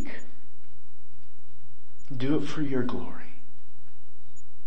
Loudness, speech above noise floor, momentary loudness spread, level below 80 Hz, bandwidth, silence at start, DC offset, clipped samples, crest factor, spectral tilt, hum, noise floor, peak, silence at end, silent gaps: -32 LUFS; 30 dB; 20 LU; -62 dBFS; 8.8 kHz; 0 s; 10%; under 0.1%; 20 dB; -7 dB/octave; none; -59 dBFS; -12 dBFS; 0.25 s; none